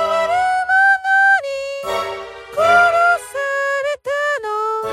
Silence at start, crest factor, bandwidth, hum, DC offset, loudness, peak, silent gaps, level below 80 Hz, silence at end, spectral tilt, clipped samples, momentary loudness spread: 0 s; 14 dB; 15 kHz; none; under 0.1%; -16 LUFS; -2 dBFS; none; -56 dBFS; 0 s; -1.5 dB/octave; under 0.1%; 11 LU